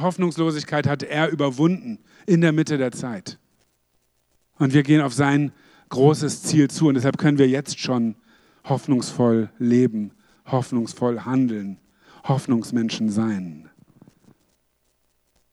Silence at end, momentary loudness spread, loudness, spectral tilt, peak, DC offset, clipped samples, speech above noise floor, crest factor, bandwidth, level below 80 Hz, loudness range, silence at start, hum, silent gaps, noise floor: 1.9 s; 13 LU; -21 LUFS; -6.5 dB/octave; -4 dBFS; under 0.1%; under 0.1%; 48 dB; 18 dB; 12.5 kHz; -68 dBFS; 5 LU; 0 s; none; none; -68 dBFS